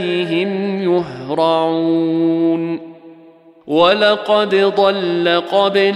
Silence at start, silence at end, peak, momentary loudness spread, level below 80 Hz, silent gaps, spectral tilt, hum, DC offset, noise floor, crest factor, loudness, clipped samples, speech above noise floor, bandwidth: 0 s; 0 s; -2 dBFS; 6 LU; -62 dBFS; none; -6.5 dB/octave; none; under 0.1%; -44 dBFS; 14 dB; -15 LUFS; under 0.1%; 29 dB; 10.5 kHz